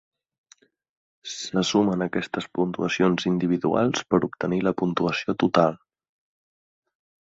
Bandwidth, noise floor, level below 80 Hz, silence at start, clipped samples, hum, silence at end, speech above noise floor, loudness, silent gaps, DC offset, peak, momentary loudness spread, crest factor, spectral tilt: 7.8 kHz; -59 dBFS; -60 dBFS; 1.25 s; under 0.1%; none; 1.6 s; 36 dB; -24 LUFS; none; under 0.1%; -4 dBFS; 7 LU; 22 dB; -5.5 dB/octave